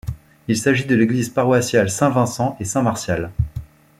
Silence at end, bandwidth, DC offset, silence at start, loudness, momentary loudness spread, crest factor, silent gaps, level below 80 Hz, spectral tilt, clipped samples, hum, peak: 0.35 s; 16 kHz; under 0.1%; 0.05 s; -19 LUFS; 10 LU; 16 dB; none; -40 dBFS; -5.5 dB/octave; under 0.1%; none; -2 dBFS